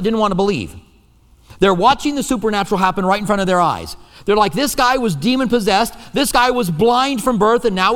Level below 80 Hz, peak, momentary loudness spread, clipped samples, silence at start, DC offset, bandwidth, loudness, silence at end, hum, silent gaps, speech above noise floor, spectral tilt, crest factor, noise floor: -40 dBFS; 0 dBFS; 5 LU; under 0.1%; 0 s; under 0.1%; 18.5 kHz; -16 LUFS; 0 s; none; none; 34 dB; -4.5 dB/octave; 16 dB; -50 dBFS